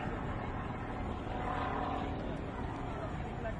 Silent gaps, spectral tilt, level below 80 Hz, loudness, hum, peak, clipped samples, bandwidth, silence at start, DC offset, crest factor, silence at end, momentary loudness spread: none; -7.5 dB/octave; -46 dBFS; -39 LUFS; none; -24 dBFS; under 0.1%; 10.5 kHz; 0 s; under 0.1%; 14 dB; 0 s; 4 LU